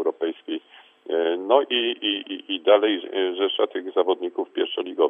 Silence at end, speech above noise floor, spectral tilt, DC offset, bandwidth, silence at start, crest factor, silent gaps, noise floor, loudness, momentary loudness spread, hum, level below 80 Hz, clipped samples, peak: 0 s; 27 dB; -5.5 dB/octave; under 0.1%; 3.8 kHz; 0 s; 20 dB; none; -50 dBFS; -23 LUFS; 10 LU; none; -82 dBFS; under 0.1%; -4 dBFS